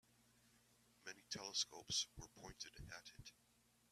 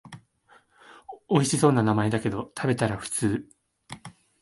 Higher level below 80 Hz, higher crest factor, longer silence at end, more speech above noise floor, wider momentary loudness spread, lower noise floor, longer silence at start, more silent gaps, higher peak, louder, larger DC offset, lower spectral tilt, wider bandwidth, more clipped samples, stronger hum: second, -72 dBFS vs -56 dBFS; about the same, 24 dB vs 20 dB; first, 0.6 s vs 0.3 s; second, 25 dB vs 36 dB; second, 17 LU vs 22 LU; first, -75 dBFS vs -60 dBFS; first, 1 s vs 0.05 s; neither; second, -28 dBFS vs -6 dBFS; second, -47 LUFS vs -25 LUFS; neither; second, -1 dB/octave vs -5.5 dB/octave; first, 15 kHz vs 12 kHz; neither; first, 60 Hz at -80 dBFS vs none